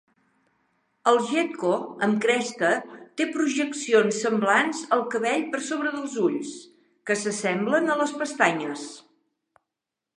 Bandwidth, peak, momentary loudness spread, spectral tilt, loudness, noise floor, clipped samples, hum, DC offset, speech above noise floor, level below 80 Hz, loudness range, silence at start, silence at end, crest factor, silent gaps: 11.5 kHz; -4 dBFS; 9 LU; -4 dB/octave; -24 LUFS; -86 dBFS; under 0.1%; none; under 0.1%; 62 dB; -80 dBFS; 3 LU; 1.05 s; 1.2 s; 22 dB; none